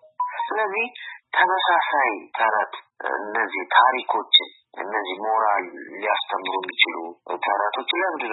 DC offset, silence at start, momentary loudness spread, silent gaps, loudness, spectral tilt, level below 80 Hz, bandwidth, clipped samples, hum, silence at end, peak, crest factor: under 0.1%; 0.2 s; 12 LU; none; -22 LUFS; -5.5 dB/octave; under -90 dBFS; 4.2 kHz; under 0.1%; none; 0 s; -2 dBFS; 22 dB